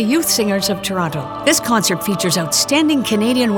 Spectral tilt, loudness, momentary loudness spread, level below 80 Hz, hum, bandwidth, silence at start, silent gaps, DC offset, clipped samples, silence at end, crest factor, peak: -3.5 dB/octave; -16 LUFS; 5 LU; -52 dBFS; none; 19.5 kHz; 0 s; none; under 0.1%; under 0.1%; 0 s; 14 dB; -2 dBFS